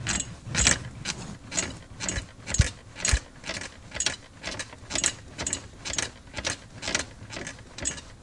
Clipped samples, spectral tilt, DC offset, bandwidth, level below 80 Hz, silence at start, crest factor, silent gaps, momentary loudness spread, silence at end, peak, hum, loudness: under 0.1%; -2 dB/octave; under 0.1%; 11.5 kHz; -40 dBFS; 0 s; 32 dB; none; 10 LU; 0 s; 0 dBFS; none; -29 LUFS